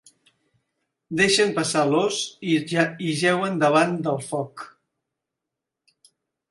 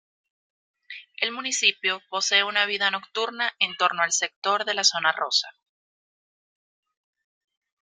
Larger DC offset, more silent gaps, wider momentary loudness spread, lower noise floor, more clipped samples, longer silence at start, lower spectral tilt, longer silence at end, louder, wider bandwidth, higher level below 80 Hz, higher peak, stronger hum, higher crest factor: neither; second, none vs 4.36-4.42 s; first, 11 LU vs 8 LU; second, -85 dBFS vs under -90 dBFS; neither; first, 1.1 s vs 0.9 s; first, -4 dB/octave vs 1 dB/octave; second, 1.85 s vs 2.3 s; about the same, -22 LUFS vs -23 LUFS; second, 11.5 kHz vs 13.5 kHz; first, -66 dBFS vs -82 dBFS; about the same, -4 dBFS vs -4 dBFS; neither; about the same, 20 dB vs 22 dB